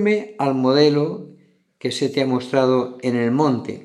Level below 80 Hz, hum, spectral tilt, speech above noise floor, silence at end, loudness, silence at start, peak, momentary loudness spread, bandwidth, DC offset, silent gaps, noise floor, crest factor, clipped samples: -74 dBFS; none; -6 dB/octave; 34 dB; 0.05 s; -19 LUFS; 0 s; -2 dBFS; 10 LU; 11.5 kHz; under 0.1%; none; -52 dBFS; 18 dB; under 0.1%